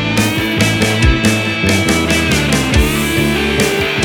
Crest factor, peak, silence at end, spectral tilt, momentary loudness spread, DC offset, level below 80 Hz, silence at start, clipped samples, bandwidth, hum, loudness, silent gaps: 14 dB; 0 dBFS; 0 s; -4.5 dB/octave; 2 LU; under 0.1%; -22 dBFS; 0 s; under 0.1%; 20 kHz; none; -13 LUFS; none